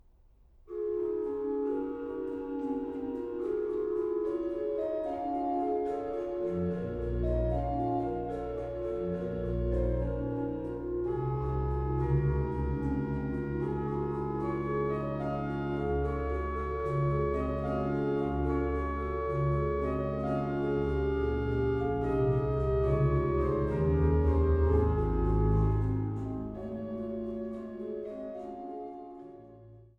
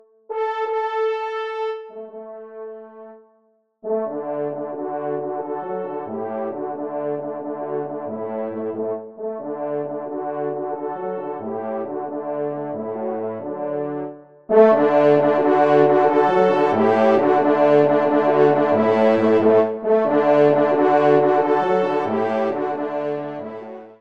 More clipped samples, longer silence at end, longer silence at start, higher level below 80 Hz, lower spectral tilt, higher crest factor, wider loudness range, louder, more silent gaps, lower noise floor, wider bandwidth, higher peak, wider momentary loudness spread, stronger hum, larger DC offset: neither; about the same, 0.1 s vs 0.05 s; first, 0.65 s vs 0.3 s; first, -38 dBFS vs -70 dBFS; first, -10.5 dB/octave vs -8 dB/octave; about the same, 16 dB vs 18 dB; second, 6 LU vs 12 LU; second, -32 LUFS vs -20 LUFS; neither; about the same, -60 dBFS vs -62 dBFS; second, 5.2 kHz vs 6.6 kHz; second, -16 dBFS vs -2 dBFS; second, 9 LU vs 14 LU; neither; second, under 0.1% vs 0.1%